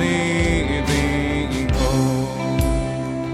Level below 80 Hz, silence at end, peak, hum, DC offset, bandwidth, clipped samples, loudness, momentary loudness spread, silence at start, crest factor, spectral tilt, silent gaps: -26 dBFS; 0 s; -6 dBFS; none; under 0.1%; 15.5 kHz; under 0.1%; -20 LUFS; 4 LU; 0 s; 14 dB; -5.5 dB/octave; none